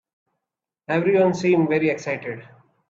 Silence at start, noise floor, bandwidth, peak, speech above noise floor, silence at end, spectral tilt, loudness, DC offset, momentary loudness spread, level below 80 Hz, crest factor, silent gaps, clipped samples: 0.9 s; -85 dBFS; 7.6 kHz; -6 dBFS; 65 dB; 0.45 s; -7 dB/octave; -21 LUFS; under 0.1%; 12 LU; -66 dBFS; 16 dB; none; under 0.1%